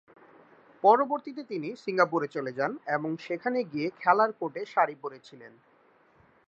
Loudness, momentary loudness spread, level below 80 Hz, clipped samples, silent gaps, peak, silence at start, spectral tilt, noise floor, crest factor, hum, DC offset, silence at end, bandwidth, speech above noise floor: -28 LUFS; 13 LU; -80 dBFS; under 0.1%; none; -8 dBFS; 0.85 s; -6.5 dB/octave; -63 dBFS; 22 dB; none; under 0.1%; 1 s; 7.8 kHz; 34 dB